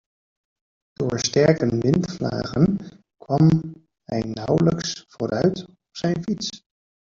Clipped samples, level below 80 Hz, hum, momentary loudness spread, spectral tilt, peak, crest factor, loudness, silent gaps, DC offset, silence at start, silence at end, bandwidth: under 0.1%; -52 dBFS; none; 12 LU; -6 dB/octave; -4 dBFS; 20 dB; -22 LUFS; none; under 0.1%; 1 s; 0.5 s; 7.4 kHz